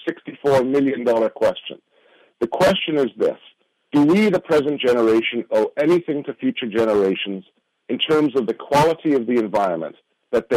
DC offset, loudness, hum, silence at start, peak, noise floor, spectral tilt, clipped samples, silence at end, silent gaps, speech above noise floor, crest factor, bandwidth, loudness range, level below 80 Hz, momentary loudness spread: under 0.1%; -19 LUFS; none; 0 s; -6 dBFS; -56 dBFS; -6 dB/octave; under 0.1%; 0 s; none; 37 dB; 14 dB; 15.5 kHz; 2 LU; -56 dBFS; 10 LU